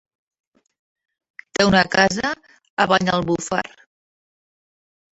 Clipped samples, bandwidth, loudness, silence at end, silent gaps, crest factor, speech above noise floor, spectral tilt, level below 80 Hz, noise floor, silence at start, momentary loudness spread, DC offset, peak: under 0.1%; 8.2 kHz; -19 LUFS; 1.45 s; 2.70-2.77 s; 22 dB; over 71 dB; -4 dB/octave; -50 dBFS; under -90 dBFS; 1.6 s; 15 LU; under 0.1%; -2 dBFS